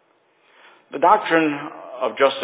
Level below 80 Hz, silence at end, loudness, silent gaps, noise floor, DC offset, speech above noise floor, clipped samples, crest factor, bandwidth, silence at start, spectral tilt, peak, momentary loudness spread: -76 dBFS; 0 s; -19 LUFS; none; -60 dBFS; under 0.1%; 41 dB; under 0.1%; 20 dB; 4 kHz; 0.9 s; -8 dB/octave; 0 dBFS; 16 LU